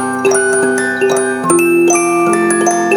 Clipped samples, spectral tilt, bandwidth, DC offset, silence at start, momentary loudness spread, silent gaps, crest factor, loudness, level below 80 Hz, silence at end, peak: under 0.1%; -3.5 dB/octave; 19.5 kHz; under 0.1%; 0 s; 3 LU; none; 12 dB; -12 LUFS; -58 dBFS; 0 s; 0 dBFS